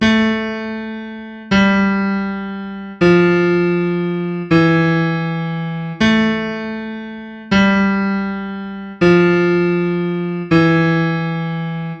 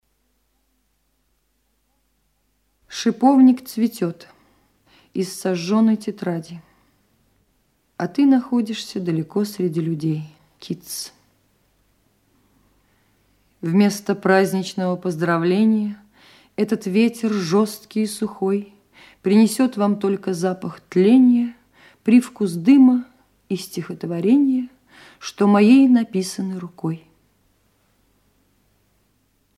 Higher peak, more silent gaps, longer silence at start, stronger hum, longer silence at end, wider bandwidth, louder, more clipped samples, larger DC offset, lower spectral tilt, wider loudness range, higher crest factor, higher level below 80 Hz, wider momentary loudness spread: first, 0 dBFS vs -4 dBFS; neither; second, 0 s vs 2.9 s; neither; second, 0 s vs 2.6 s; second, 7.2 kHz vs 14.5 kHz; first, -16 LUFS vs -19 LUFS; neither; neither; about the same, -7.5 dB/octave vs -6.5 dB/octave; second, 2 LU vs 9 LU; about the same, 16 dB vs 18 dB; first, -44 dBFS vs -68 dBFS; second, 14 LU vs 17 LU